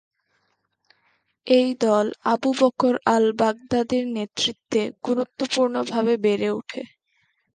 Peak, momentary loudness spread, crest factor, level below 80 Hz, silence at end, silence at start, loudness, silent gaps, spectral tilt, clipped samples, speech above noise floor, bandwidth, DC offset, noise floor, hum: -2 dBFS; 7 LU; 20 dB; -64 dBFS; 0.7 s; 1.45 s; -22 LUFS; none; -4.5 dB/octave; under 0.1%; 50 dB; 9.6 kHz; under 0.1%; -71 dBFS; none